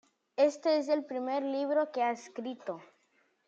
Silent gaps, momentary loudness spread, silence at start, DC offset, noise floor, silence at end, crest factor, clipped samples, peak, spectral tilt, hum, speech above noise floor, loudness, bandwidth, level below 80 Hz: none; 13 LU; 0.4 s; under 0.1%; -72 dBFS; 0.6 s; 18 dB; under 0.1%; -14 dBFS; -4 dB/octave; none; 41 dB; -32 LUFS; 7.8 kHz; under -90 dBFS